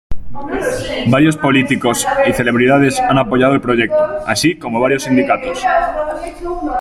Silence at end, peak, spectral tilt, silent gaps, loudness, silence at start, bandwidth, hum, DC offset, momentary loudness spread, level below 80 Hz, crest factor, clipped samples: 0 s; 0 dBFS; -5 dB/octave; none; -14 LUFS; 0.1 s; 15 kHz; none; under 0.1%; 10 LU; -36 dBFS; 14 dB; under 0.1%